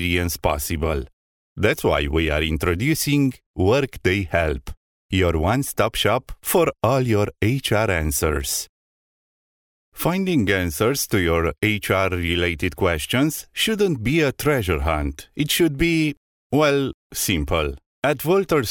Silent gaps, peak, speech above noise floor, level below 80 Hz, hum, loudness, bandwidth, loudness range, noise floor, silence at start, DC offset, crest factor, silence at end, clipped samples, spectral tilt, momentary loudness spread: 1.13-1.56 s, 3.46-3.54 s, 4.77-5.09 s, 8.69-9.92 s, 16.17-16.50 s, 16.94-17.10 s, 17.86-18.02 s; -4 dBFS; over 69 dB; -36 dBFS; none; -21 LUFS; 19 kHz; 2 LU; under -90 dBFS; 0 s; under 0.1%; 18 dB; 0 s; under 0.1%; -5 dB/octave; 6 LU